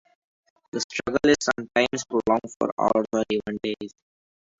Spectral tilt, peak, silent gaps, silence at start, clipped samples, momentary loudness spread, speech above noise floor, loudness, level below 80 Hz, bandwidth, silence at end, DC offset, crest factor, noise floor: -4 dB/octave; -6 dBFS; 0.84-0.90 s, 2.56-2.60 s, 2.72-2.77 s; 0.75 s; under 0.1%; 10 LU; over 66 dB; -25 LUFS; -56 dBFS; 8 kHz; 0.7 s; under 0.1%; 20 dB; under -90 dBFS